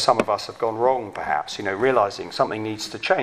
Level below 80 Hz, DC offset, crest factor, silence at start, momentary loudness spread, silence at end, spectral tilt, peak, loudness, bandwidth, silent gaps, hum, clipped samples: -58 dBFS; under 0.1%; 20 dB; 0 s; 8 LU; 0 s; -4 dB/octave; -2 dBFS; -23 LUFS; 15 kHz; none; none; under 0.1%